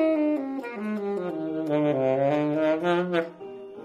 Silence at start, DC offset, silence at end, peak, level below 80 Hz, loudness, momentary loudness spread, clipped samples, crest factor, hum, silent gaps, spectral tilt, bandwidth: 0 s; under 0.1%; 0 s; -10 dBFS; -70 dBFS; -26 LUFS; 9 LU; under 0.1%; 16 dB; none; none; -8 dB/octave; 8.6 kHz